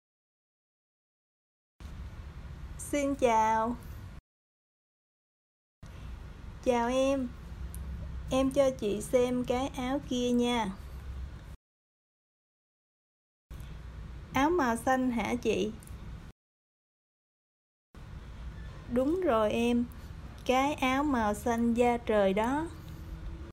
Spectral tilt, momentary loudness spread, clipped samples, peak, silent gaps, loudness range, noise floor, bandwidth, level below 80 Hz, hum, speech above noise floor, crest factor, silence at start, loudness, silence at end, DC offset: -5.5 dB/octave; 19 LU; under 0.1%; -14 dBFS; 4.20-5.82 s, 11.56-13.50 s, 16.32-17.94 s; 11 LU; under -90 dBFS; 16 kHz; -48 dBFS; none; over 62 dB; 18 dB; 1.8 s; -30 LUFS; 0 s; under 0.1%